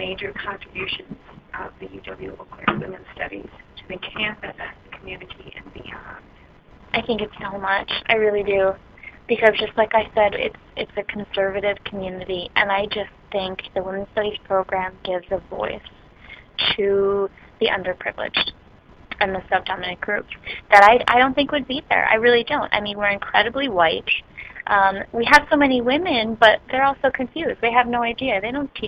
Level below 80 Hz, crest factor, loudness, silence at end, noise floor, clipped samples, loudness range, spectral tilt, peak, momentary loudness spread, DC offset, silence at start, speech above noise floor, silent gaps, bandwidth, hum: -48 dBFS; 22 dB; -20 LUFS; 0 s; -48 dBFS; under 0.1%; 13 LU; -4.5 dB/octave; 0 dBFS; 20 LU; under 0.1%; 0 s; 27 dB; none; 16 kHz; none